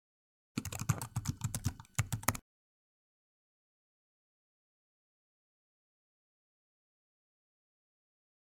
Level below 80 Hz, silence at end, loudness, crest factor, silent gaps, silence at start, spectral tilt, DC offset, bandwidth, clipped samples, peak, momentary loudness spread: -60 dBFS; 6.05 s; -38 LUFS; 38 dB; none; 0.55 s; -4 dB/octave; under 0.1%; 18 kHz; under 0.1%; -6 dBFS; 8 LU